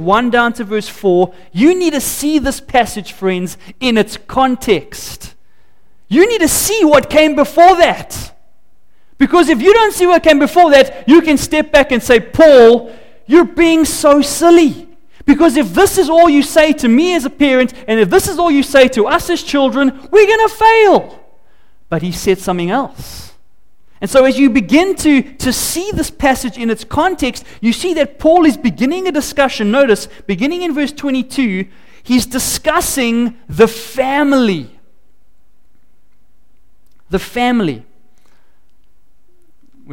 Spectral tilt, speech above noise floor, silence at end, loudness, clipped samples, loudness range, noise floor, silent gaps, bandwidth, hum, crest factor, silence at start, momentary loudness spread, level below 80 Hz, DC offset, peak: -4 dB/octave; 47 dB; 0 s; -11 LUFS; under 0.1%; 8 LU; -58 dBFS; none; 17 kHz; none; 12 dB; 0 s; 11 LU; -36 dBFS; 2%; 0 dBFS